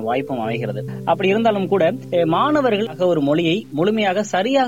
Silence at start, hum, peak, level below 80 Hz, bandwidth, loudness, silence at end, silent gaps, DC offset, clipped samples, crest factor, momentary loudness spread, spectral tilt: 0 s; none; -6 dBFS; -62 dBFS; 17 kHz; -19 LUFS; 0 s; none; 0.3%; under 0.1%; 12 dB; 7 LU; -6 dB/octave